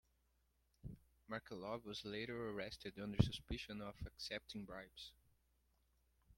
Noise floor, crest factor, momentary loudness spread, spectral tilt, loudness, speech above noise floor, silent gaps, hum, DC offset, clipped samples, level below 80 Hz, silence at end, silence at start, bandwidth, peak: -81 dBFS; 30 dB; 18 LU; -6 dB/octave; -47 LUFS; 34 dB; none; none; under 0.1%; under 0.1%; -62 dBFS; 0.05 s; 0.85 s; 16.5 kHz; -18 dBFS